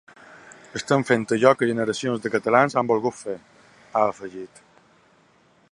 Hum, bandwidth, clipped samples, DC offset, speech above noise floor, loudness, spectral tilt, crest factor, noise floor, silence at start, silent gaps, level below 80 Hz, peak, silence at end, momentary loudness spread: none; 11.5 kHz; under 0.1%; under 0.1%; 37 dB; -22 LUFS; -5.5 dB/octave; 22 dB; -59 dBFS; 0.45 s; none; -66 dBFS; -2 dBFS; 1.25 s; 18 LU